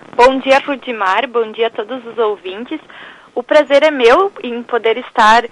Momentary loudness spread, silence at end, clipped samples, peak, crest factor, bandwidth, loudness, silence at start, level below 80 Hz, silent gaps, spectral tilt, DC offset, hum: 15 LU; 0.05 s; under 0.1%; 0 dBFS; 12 dB; 11.5 kHz; -13 LUFS; 0.15 s; -48 dBFS; none; -3 dB/octave; under 0.1%; none